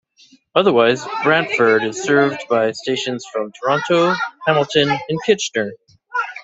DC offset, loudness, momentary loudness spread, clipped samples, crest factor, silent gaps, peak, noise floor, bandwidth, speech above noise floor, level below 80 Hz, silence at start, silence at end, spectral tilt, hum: under 0.1%; -17 LUFS; 9 LU; under 0.1%; 16 dB; none; -2 dBFS; -52 dBFS; 8.2 kHz; 35 dB; -62 dBFS; 0.55 s; 0 s; -4.5 dB/octave; none